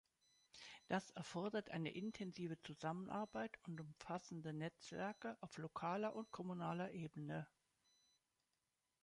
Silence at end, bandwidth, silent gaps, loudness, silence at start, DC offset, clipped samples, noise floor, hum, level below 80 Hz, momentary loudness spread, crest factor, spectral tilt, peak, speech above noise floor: 1.55 s; 11 kHz; none; -49 LUFS; 0.55 s; under 0.1%; under 0.1%; -90 dBFS; none; -82 dBFS; 8 LU; 20 dB; -6 dB/octave; -30 dBFS; 42 dB